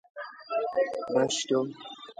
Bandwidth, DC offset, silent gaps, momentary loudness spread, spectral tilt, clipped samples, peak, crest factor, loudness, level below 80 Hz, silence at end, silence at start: 9.6 kHz; under 0.1%; none; 16 LU; -3.5 dB/octave; under 0.1%; -12 dBFS; 18 dB; -29 LUFS; -74 dBFS; 0.05 s; 0.15 s